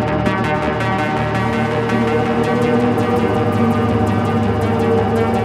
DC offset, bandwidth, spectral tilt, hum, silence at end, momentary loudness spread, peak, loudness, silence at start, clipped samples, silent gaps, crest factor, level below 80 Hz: under 0.1%; 14 kHz; -7.5 dB/octave; none; 0 s; 2 LU; -4 dBFS; -17 LUFS; 0 s; under 0.1%; none; 12 dB; -36 dBFS